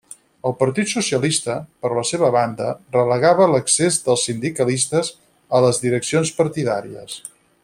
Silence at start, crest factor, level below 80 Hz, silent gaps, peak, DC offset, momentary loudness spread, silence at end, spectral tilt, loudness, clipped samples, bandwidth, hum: 0.45 s; 16 dB; -58 dBFS; none; -2 dBFS; under 0.1%; 11 LU; 0.35 s; -4 dB/octave; -19 LUFS; under 0.1%; 16 kHz; none